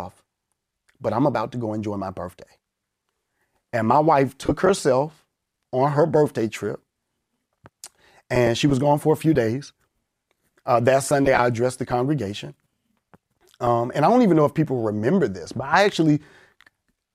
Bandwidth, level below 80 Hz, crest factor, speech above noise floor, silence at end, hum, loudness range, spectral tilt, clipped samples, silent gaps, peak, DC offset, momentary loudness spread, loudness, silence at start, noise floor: 15.5 kHz; -52 dBFS; 18 dB; 59 dB; 0.95 s; none; 5 LU; -6 dB/octave; under 0.1%; none; -4 dBFS; under 0.1%; 13 LU; -21 LUFS; 0 s; -79 dBFS